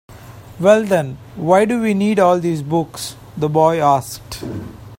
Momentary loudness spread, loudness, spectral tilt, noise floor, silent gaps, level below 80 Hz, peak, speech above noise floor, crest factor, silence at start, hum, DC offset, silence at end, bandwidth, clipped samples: 15 LU; -16 LUFS; -6 dB/octave; -37 dBFS; none; -48 dBFS; 0 dBFS; 21 dB; 16 dB; 0.1 s; none; under 0.1%; 0.05 s; 16.5 kHz; under 0.1%